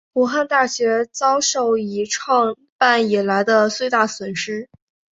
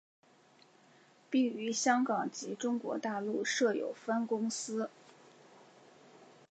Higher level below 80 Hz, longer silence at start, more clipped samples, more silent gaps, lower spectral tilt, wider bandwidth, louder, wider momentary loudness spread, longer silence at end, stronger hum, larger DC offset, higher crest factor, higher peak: first, -66 dBFS vs under -90 dBFS; second, 0.15 s vs 1.3 s; neither; first, 2.72-2.79 s vs none; about the same, -3 dB/octave vs -3.5 dB/octave; about the same, 8 kHz vs 8.8 kHz; first, -18 LUFS vs -34 LUFS; about the same, 8 LU vs 8 LU; first, 0.45 s vs 0.25 s; neither; neither; about the same, 18 dB vs 22 dB; first, 0 dBFS vs -14 dBFS